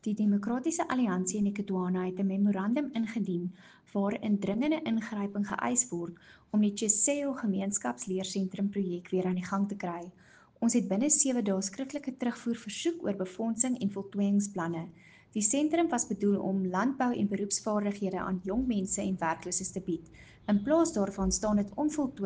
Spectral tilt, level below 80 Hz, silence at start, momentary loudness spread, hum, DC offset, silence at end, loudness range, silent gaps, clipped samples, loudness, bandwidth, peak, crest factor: -5 dB/octave; -58 dBFS; 0.05 s; 8 LU; none; under 0.1%; 0 s; 2 LU; none; under 0.1%; -31 LUFS; 10 kHz; -10 dBFS; 20 dB